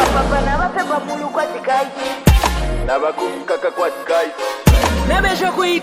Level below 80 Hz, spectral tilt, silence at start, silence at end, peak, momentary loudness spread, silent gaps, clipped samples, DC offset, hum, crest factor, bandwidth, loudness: -22 dBFS; -5 dB/octave; 0 s; 0 s; 0 dBFS; 7 LU; none; under 0.1%; under 0.1%; none; 16 dB; 16 kHz; -17 LUFS